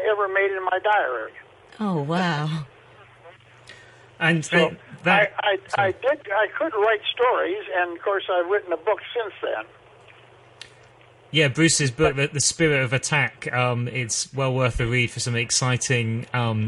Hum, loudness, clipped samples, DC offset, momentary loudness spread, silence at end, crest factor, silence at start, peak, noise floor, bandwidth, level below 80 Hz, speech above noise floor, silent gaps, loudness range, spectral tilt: none; -22 LUFS; under 0.1%; under 0.1%; 8 LU; 0 s; 18 dB; 0 s; -4 dBFS; -51 dBFS; 11.5 kHz; -48 dBFS; 29 dB; none; 6 LU; -4 dB/octave